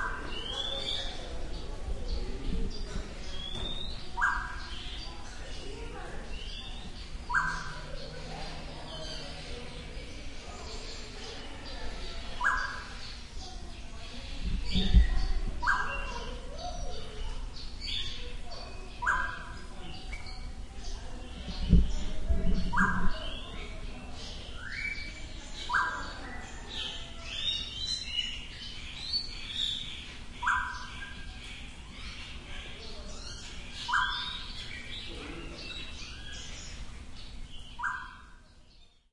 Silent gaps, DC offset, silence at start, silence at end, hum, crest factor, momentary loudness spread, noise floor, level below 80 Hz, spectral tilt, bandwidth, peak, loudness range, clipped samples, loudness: none; under 0.1%; 0 s; 0.25 s; none; 26 dB; 14 LU; -57 dBFS; -38 dBFS; -4 dB/octave; 11 kHz; -8 dBFS; 9 LU; under 0.1%; -36 LUFS